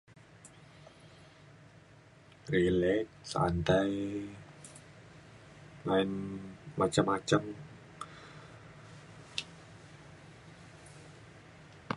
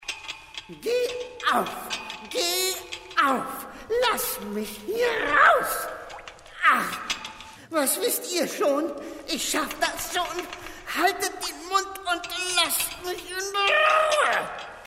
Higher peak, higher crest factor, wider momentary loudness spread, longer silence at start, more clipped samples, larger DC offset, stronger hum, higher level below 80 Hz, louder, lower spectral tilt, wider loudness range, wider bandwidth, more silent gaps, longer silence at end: second, -12 dBFS vs -6 dBFS; about the same, 24 dB vs 20 dB; first, 25 LU vs 15 LU; first, 0.45 s vs 0 s; neither; neither; neither; about the same, -56 dBFS vs -56 dBFS; second, -32 LUFS vs -25 LUFS; first, -5.5 dB/octave vs -1 dB/octave; first, 15 LU vs 4 LU; second, 11.5 kHz vs 16 kHz; neither; about the same, 0 s vs 0 s